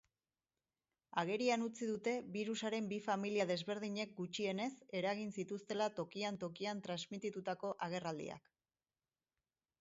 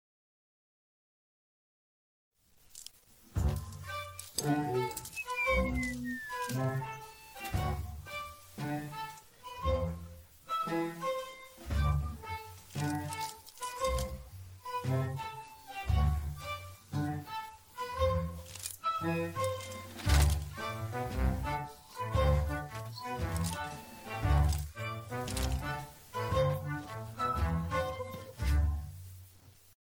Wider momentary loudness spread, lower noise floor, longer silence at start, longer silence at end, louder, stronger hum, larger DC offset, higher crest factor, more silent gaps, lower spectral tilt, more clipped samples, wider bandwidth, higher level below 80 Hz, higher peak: second, 7 LU vs 14 LU; first, under -90 dBFS vs -59 dBFS; second, 1.15 s vs 2.75 s; first, 1.4 s vs 0.35 s; second, -41 LUFS vs -35 LUFS; neither; neither; about the same, 22 dB vs 22 dB; neither; second, -4 dB/octave vs -5.5 dB/octave; neither; second, 7.6 kHz vs 19.5 kHz; second, -84 dBFS vs -40 dBFS; second, -20 dBFS vs -14 dBFS